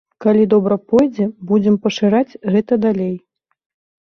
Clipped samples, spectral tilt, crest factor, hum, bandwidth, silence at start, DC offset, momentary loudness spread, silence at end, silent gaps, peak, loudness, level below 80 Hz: under 0.1%; -7.5 dB/octave; 14 dB; none; 6.8 kHz; 0.2 s; under 0.1%; 7 LU; 0.85 s; none; -2 dBFS; -16 LUFS; -56 dBFS